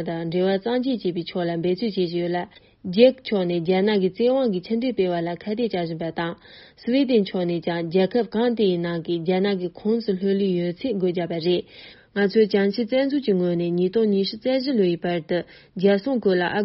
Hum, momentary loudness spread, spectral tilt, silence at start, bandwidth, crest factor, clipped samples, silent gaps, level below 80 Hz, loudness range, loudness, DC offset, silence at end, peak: none; 8 LU; -5.5 dB/octave; 0 s; 5.8 kHz; 20 dB; under 0.1%; none; -62 dBFS; 2 LU; -23 LUFS; under 0.1%; 0 s; -2 dBFS